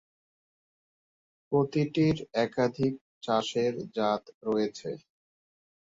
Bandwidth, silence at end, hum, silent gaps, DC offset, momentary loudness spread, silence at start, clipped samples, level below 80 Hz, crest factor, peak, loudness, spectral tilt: 7.8 kHz; 0.85 s; none; 3.01-3.21 s, 4.34-4.41 s; under 0.1%; 9 LU; 1.5 s; under 0.1%; -62 dBFS; 18 dB; -12 dBFS; -29 LUFS; -6.5 dB/octave